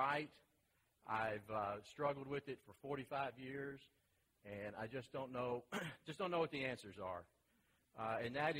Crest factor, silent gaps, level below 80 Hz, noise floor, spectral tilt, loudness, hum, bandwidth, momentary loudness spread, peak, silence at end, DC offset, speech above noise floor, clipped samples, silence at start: 20 dB; none; -78 dBFS; -81 dBFS; -5.5 dB/octave; -46 LUFS; none; 16 kHz; 12 LU; -26 dBFS; 0 s; under 0.1%; 36 dB; under 0.1%; 0 s